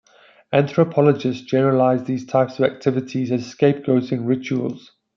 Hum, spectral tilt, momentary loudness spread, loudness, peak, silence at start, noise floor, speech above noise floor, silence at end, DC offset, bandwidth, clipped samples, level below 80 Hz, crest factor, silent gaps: none; -8 dB/octave; 7 LU; -20 LUFS; -2 dBFS; 0.5 s; -50 dBFS; 31 dB; 0.4 s; under 0.1%; 7.2 kHz; under 0.1%; -66 dBFS; 16 dB; none